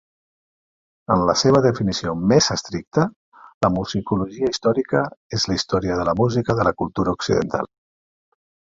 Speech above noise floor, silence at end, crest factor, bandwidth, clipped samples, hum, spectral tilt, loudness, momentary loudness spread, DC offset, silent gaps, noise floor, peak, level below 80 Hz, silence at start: over 70 dB; 1 s; 18 dB; 7.8 kHz; under 0.1%; none; -5 dB/octave; -20 LUFS; 8 LU; under 0.1%; 2.87-2.91 s, 3.16-3.32 s, 3.54-3.61 s, 5.17-5.30 s; under -90 dBFS; -2 dBFS; -46 dBFS; 1.1 s